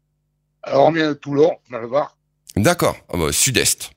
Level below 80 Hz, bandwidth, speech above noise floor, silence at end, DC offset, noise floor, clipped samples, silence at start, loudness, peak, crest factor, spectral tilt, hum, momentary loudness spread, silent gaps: -44 dBFS; 16.5 kHz; 51 dB; 0.1 s; under 0.1%; -69 dBFS; under 0.1%; 0.65 s; -18 LUFS; 0 dBFS; 20 dB; -3.5 dB/octave; none; 12 LU; none